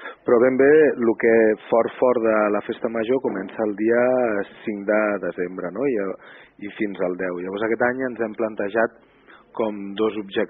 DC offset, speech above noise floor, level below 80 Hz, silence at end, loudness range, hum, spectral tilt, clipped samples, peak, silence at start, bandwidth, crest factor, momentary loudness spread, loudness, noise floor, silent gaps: under 0.1%; 29 dB; -64 dBFS; 0 s; 7 LU; none; -5 dB/octave; under 0.1%; -6 dBFS; 0 s; 4 kHz; 16 dB; 11 LU; -21 LUFS; -50 dBFS; none